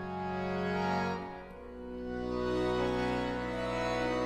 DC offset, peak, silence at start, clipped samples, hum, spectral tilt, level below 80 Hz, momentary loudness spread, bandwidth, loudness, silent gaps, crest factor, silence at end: under 0.1%; -20 dBFS; 0 s; under 0.1%; none; -6.5 dB/octave; -50 dBFS; 12 LU; 13 kHz; -34 LUFS; none; 14 dB; 0 s